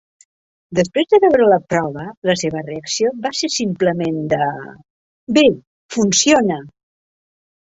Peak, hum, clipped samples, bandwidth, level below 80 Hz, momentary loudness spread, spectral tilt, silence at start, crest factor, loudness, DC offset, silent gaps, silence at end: -2 dBFS; none; under 0.1%; 8 kHz; -54 dBFS; 14 LU; -4 dB/octave; 0.7 s; 16 dB; -17 LUFS; under 0.1%; 2.17-2.22 s, 4.90-5.27 s, 5.67-5.89 s; 0.95 s